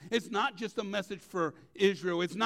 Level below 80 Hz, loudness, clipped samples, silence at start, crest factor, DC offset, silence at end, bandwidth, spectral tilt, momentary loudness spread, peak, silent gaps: -74 dBFS; -33 LUFS; under 0.1%; 0 s; 20 dB; under 0.1%; 0 s; 15 kHz; -4.5 dB/octave; 7 LU; -14 dBFS; none